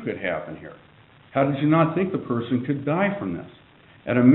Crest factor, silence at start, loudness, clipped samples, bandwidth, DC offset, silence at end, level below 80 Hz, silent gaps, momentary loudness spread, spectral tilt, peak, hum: 20 dB; 0 s; -24 LUFS; under 0.1%; 4.1 kHz; under 0.1%; 0 s; -60 dBFS; none; 19 LU; -7 dB/octave; -4 dBFS; none